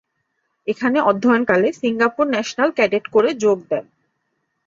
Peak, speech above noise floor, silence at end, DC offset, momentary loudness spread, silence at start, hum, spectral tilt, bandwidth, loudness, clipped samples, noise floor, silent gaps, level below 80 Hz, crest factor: -2 dBFS; 54 dB; 0.85 s; under 0.1%; 9 LU; 0.65 s; none; -5 dB/octave; 7.6 kHz; -18 LUFS; under 0.1%; -72 dBFS; none; -62 dBFS; 18 dB